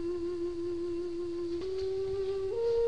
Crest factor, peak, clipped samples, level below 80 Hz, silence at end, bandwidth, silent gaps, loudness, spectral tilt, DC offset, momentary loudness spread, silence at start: 12 dB; -22 dBFS; under 0.1%; -54 dBFS; 0 s; 9.8 kHz; none; -35 LUFS; -7 dB/octave; 0.5%; 3 LU; 0 s